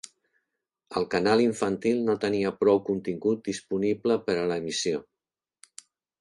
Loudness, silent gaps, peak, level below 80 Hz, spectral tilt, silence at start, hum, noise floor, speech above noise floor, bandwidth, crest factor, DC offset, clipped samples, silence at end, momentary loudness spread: -26 LUFS; none; -8 dBFS; -64 dBFS; -5 dB/octave; 0.05 s; none; -89 dBFS; 64 dB; 11.5 kHz; 18 dB; under 0.1%; under 0.1%; 1.2 s; 8 LU